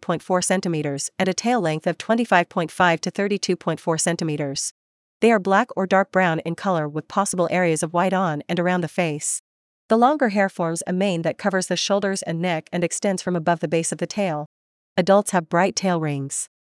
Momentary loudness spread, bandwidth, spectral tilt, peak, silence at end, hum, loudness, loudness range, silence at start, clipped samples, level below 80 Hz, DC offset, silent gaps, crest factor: 7 LU; 12 kHz; -4.5 dB/octave; -2 dBFS; 0.15 s; none; -22 LUFS; 2 LU; 0 s; under 0.1%; -70 dBFS; under 0.1%; 4.71-5.20 s, 9.39-9.89 s, 14.46-14.96 s; 20 dB